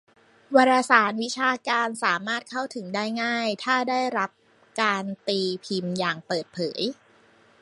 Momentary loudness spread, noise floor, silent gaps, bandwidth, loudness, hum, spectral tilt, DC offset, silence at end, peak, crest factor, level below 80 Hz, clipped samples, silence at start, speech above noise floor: 11 LU; -57 dBFS; none; 11.5 kHz; -24 LUFS; none; -4 dB/octave; under 0.1%; 0.7 s; -2 dBFS; 22 dB; -76 dBFS; under 0.1%; 0.5 s; 33 dB